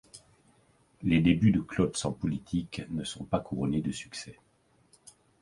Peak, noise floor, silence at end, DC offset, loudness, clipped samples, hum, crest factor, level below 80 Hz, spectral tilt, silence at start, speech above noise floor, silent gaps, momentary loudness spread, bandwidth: -12 dBFS; -65 dBFS; 1.1 s; under 0.1%; -30 LUFS; under 0.1%; none; 20 dB; -52 dBFS; -6 dB/octave; 0.15 s; 36 dB; none; 13 LU; 11.5 kHz